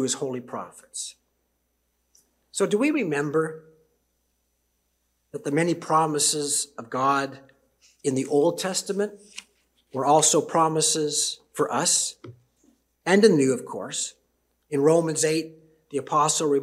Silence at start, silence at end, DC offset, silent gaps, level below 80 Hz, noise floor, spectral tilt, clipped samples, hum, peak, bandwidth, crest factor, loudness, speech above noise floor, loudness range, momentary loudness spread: 0 s; 0 s; under 0.1%; none; -74 dBFS; -73 dBFS; -3.5 dB/octave; under 0.1%; none; -4 dBFS; 15.5 kHz; 22 dB; -23 LUFS; 50 dB; 6 LU; 16 LU